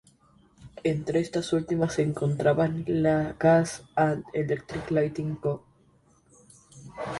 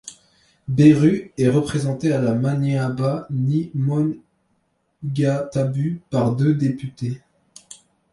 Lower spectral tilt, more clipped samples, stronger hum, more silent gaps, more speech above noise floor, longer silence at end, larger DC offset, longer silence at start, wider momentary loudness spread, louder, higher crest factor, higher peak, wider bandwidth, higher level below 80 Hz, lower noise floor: about the same, -7 dB/octave vs -8 dB/octave; neither; neither; neither; second, 36 dB vs 49 dB; second, 0 s vs 0.95 s; neither; first, 0.6 s vs 0.05 s; second, 9 LU vs 13 LU; second, -26 LUFS vs -20 LUFS; about the same, 18 dB vs 18 dB; second, -8 dBFS vs -2 dBFS; about the same, 11.5 kHz vs 11.5 kHz; about the same, -56 dBFS vs -54 dBFS; second, -62 dBFS vs -68 dBFS